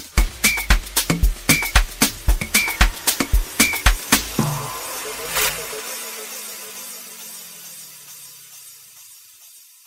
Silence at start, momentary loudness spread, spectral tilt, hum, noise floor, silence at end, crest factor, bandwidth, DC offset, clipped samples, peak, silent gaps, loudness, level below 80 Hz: 0 s; 21 LU; -2.5 dB/octave; none; -46 dBFS; 0.3 s; 22 dB; 16.5 kHz; under 0.1%; under 0.1%; 0 dBFS; none; -20 LUFS; -26 dBFS